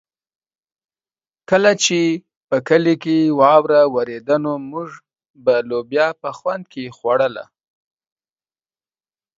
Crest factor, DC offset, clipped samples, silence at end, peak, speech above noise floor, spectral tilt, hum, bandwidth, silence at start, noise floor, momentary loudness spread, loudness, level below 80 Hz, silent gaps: 18 dB; under 0.1%; under 0.1%; 1.95 s; 0 dBFS; over 73 dB; -4.5 dB/octave; none; 7.8 kHz; 1.5 s; under -90 dBFS; 15 LU; -17 LUFS; -64 dBFS; 2.36-2.48 s, 5.30-5.34 s